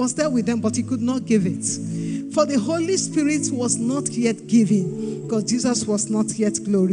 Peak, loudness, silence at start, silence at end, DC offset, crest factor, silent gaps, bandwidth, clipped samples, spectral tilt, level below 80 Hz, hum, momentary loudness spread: -6 dBFS; -21 LUFS; 0 s; 0 s; under 0.1%; 16 dB; none; 10.5 kHz; under 0.1%; -5 dB/octave; -64 dBFS; none; 5 LU